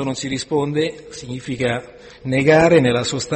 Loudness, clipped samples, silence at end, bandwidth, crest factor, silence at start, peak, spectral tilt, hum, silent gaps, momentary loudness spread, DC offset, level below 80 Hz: -18 LUFS; under 0.1%; 0 s; 8.8 kHz; 16 dB; 0 s; -2 dBFS; -5 dB/octave; none; none; 17 LU; under 0.1%; -48 dBFS